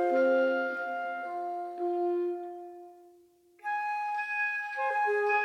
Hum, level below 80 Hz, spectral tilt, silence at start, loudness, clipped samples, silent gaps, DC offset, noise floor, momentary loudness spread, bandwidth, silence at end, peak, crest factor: none; -88 dBFS; -3.5 dB/octave; 0 s; -31 LUFS; under 0.1%; none; under 0.1%; -61 dBFS; 14 LU; 9.4 kHz; 0 s; -18 dBFS; 14 dB